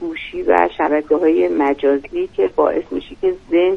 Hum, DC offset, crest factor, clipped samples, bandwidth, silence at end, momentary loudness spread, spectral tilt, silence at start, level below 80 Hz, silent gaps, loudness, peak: none; under 0.1%; 16 dB; under 0.1%; 6.4 kHz; 0 s; 8 LU; -6.5 dB/octave; 0 s; -46 dBFS; none; -17 LUFS; 0 dBFS